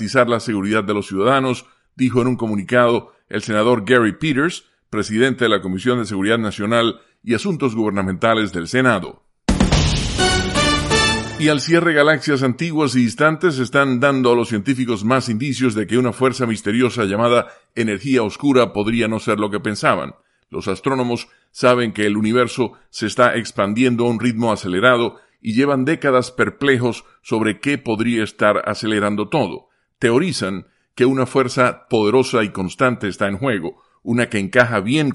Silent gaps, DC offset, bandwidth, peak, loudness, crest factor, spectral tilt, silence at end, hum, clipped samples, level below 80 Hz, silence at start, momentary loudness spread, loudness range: none; under 0.1%; 11.5 kHz; 0 dBFS; -18 LUFS; 18 dB; -5 dB/octave; 0 s; none; under 0.1%; -38 dBFS; 0 s; 8 LU; 3 LU